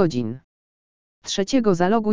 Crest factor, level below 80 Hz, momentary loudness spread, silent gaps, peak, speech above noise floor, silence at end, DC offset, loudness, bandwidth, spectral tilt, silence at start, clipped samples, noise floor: 18 dB; -54 dBFS; 17 LU; 0.44-1.22 s; -4 dBFS; over 70 dB; 0 s; under 0.1%; -22 LUFS; 7.6 kHz; -5.5 dB/octave; 0 s; under 0.1%; under -90 dBFS